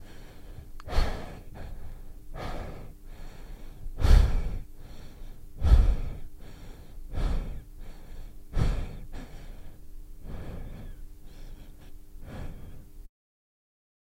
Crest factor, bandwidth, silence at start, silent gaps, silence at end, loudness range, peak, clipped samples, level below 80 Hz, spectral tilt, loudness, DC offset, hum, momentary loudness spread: 24 dB; 15 kHz; 0 s; none; 1 s; 17 LU; -6 dBFS; under 0.1%; -30 dBFS; -6.5 dB/octave; -31 LUFS; under 0.1%; none; 26 LU